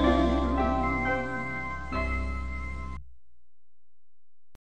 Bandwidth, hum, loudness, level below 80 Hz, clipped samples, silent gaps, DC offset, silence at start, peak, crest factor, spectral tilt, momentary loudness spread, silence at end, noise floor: 8.6 kHz; none; -29 LUFS; -36 dBFS; under 0.1%; none; 0.9%; 0 s; -10 dBFS; 20 dB; -7 dB/octave; 12 LU; 1.65 s; -85 dBFS